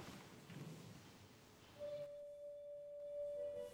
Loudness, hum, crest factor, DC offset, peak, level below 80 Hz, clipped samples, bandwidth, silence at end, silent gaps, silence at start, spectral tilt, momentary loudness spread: -52 LUFS; none; 12 dB; under 0.1%; -40 dBFS; -80 dBFS; under 0.1%; over 20 kHz; 0 s; none; 0 s; -5.5 dB/octave; 15 LU